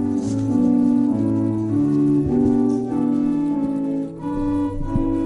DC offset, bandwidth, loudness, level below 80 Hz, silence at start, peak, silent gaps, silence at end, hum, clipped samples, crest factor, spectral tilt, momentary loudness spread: under 0.1%; 10.5 kHz; -20 LUFS; -36 dBFS; 0 s; -8 dBFS; none; 0 s; none; under 0.1%; 12 dB; -9.5 dB/octave; 6 LU